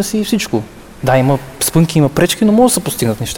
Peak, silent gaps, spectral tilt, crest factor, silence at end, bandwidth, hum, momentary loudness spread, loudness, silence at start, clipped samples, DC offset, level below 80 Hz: -2 dBFS; none; -5 dB/octave; 12 dB; 0 s; over 20 kHz; none; 9 LU; -13 LUFS; 0 s; under 0.1%; under 0.1%; -40 dBFS